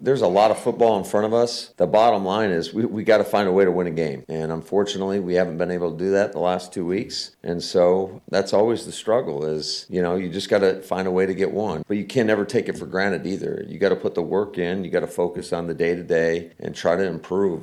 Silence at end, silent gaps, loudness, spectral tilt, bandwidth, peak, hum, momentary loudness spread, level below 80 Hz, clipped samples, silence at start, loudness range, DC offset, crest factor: 0 s; none; -22 LUFS; -5.5 dB/octave; 13.5 kHz; -6 dBFS; none; 8 LU; -58 dBFS; under 0.1%; 0 s; 4 LU; under 0.1%; 16 dB